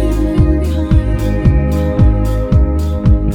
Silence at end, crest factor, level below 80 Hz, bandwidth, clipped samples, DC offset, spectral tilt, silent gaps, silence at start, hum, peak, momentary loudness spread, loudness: 0 s; 12 dB; -14 dBFS; 15 kHz; 0.2%; under 0.1%; -9 dB/octave; none; 0 s; none; 0 dBFS; 3 LU; -14 LUFS